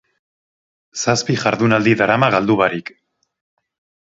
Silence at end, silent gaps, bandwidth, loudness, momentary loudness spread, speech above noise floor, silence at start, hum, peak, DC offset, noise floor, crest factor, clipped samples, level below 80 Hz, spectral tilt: 1.25 s; none; 8 kHz; -16 LUFS; 13 LU; over 74 dB; 0.95 s; none; 0 dBFS; under 0.1%; under -90 dBFS; 18 dB; under 0.1%; -56 dBFS; -5 dB/octave